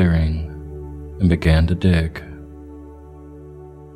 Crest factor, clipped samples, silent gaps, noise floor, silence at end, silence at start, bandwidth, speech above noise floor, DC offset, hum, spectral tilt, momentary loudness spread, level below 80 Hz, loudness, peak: 18 dB; under 0.1%; none; -39 dBFS; 0.05 s; 0 s; 10 kHz; 23 dB; under 0.1%; none; -8 dB/octave; 23 LU; -28 dBFS; -19 LUFS; -2 dBFS